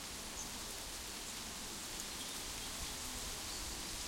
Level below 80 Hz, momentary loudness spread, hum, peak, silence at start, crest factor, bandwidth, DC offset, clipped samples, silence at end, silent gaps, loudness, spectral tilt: -56 dBFS; 2 LU; none; -26 dBFS; 0 s; 18 dB; 16.5 kHz; under 0.1%; under 0.1%; 0 s; none; -43 LUFS; -1 dB/octave